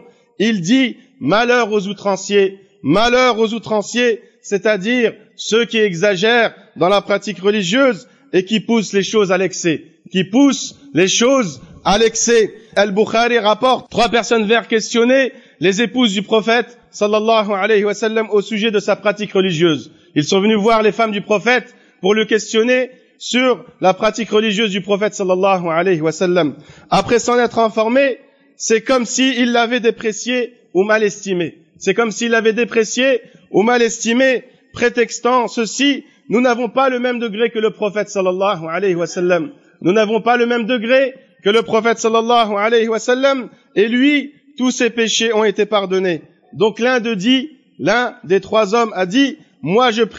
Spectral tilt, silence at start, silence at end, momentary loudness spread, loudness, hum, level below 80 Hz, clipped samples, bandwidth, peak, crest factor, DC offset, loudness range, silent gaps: -4 dB/octave; 0.4 s; 0 s; 7 LU; -16 LUFS; none; -52 dBFS; under 0.1%; 8.8 kHz; -2 dBFS; 12 dB; under 0.1%; 2 LU; none